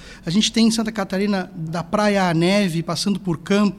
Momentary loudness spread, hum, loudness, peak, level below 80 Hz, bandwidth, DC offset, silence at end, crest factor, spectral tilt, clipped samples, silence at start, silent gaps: 7 LU; none; -20 LUFS; -6 dBFS; -50 dBFS; 13.5 kHz; under 0.1%; 0 s; 14 dB; -5 dB/octave; under 0.1%; 0 s; none